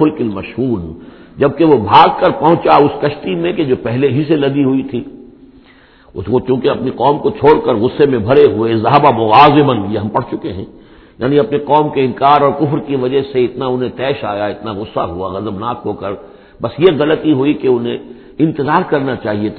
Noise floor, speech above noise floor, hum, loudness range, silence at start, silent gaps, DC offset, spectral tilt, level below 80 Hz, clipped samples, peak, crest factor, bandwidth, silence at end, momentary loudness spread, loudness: -44 dBFS; 31 dB; none; 7 LU; 0 s; none; under 0.1%; -9.5 dB/octave; -44 dBFS; 0.3%; 0 dBFS; 14 dB; 5.4 kHz; 0 s; 13 LU; -13 LUFS